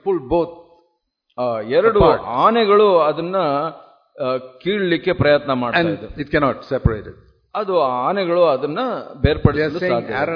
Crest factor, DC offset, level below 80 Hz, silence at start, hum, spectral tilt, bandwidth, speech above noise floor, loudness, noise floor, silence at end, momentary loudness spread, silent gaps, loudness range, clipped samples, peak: 18 dB; under 0.1%; -36 dBFS; 0.05 s; none; -9 dB/octave; 5.4 kHz; 51 dB; -18 LUFS; -68 dBFS; 0 s; 11 LU; none; 3 LU; under 0.1%; 0 dBFS